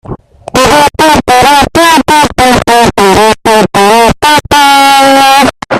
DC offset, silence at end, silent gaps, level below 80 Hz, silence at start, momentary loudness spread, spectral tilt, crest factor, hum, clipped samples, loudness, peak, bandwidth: under 0.1%; 0 s; none; -28 dBFS; 0.1 s; 4 LU; -3 dB/octave; 6 dB; none; 1%; -5 LUFS; 0 dBFS; 17 kHz